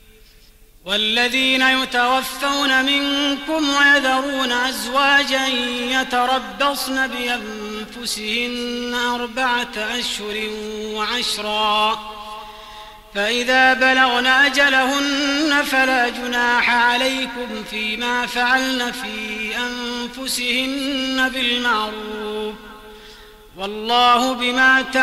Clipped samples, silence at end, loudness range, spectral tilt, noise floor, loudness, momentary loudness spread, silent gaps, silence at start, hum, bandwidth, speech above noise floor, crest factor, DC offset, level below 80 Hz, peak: under 0.1%; 0 s; 6 LU; -1.5 dB/octave; -48 dBFS; -18 LUFS; 13 LU; none; 0.85 s; none; 16 kHz; 29 dB; 16 dB; under 0.1%; -48 dBFS; -4 dBFS